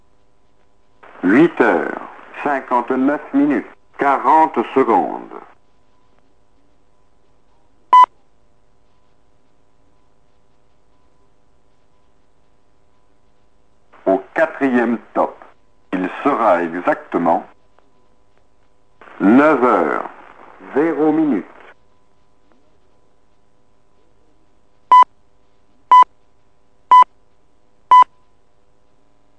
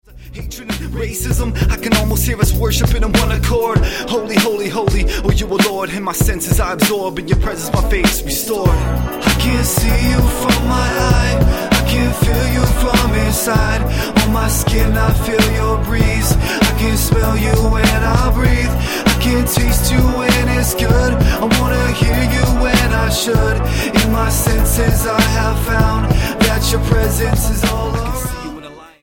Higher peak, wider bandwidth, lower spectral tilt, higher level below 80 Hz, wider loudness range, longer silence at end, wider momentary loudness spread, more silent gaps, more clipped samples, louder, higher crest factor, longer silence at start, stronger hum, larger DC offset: about the same, -2 dBFS vs 0 dBFS; second, 9 kHz vs 17.5 kHz; first, -6.5 dB/octave vs -5 dB/octave; second, -64 dBFS vs -18 dBFS; first, 8 LU vs 2 LU; first, 1.35 s vs 0.15 s; first, 13 LU vs 5 LU; neither; neither; about the same, -15 LUFS vs -15 LUFS; about the same, 18 dB vs 14 dB; first, 1.25 s vs 0.15 s; neither; first, 0.4% vs under 0.1%